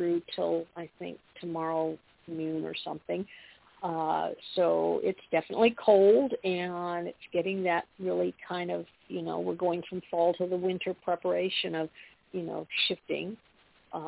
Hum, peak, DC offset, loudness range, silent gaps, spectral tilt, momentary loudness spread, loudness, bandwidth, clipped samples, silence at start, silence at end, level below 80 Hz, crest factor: none; -10 dBFS; under 0.1%; 8 LU; none; -3.5 dB/octave; 14 LU; -30 LUFS; 4 kHz; under 0.1%; 0 s; 0 s; -72 dBFS; 20 dB